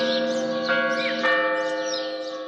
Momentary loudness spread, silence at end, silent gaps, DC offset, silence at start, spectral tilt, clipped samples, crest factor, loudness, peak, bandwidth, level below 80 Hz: 6 LU; 0 s; none; under 0.1%; 0 s; -3 dB/octave; under 0.1%; 14 dB; -23 LUFS; -10 dBFS; 8.6 kHz; -78 dBFS